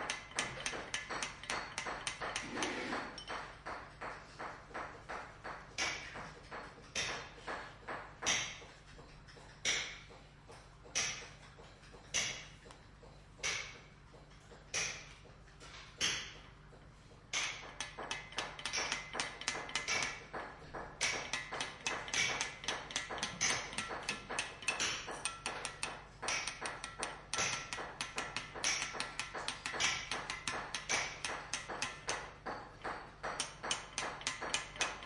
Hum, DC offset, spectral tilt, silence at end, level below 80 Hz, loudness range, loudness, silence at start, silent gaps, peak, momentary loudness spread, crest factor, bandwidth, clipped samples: none; under 0.1%; -1 dB/octave; 0 s; -62 dBFS; 5 LU; -39 LUFS; 0 s; none; -16 dBFS; 21 LU; 26 dB; 12 kHz; under 0.1%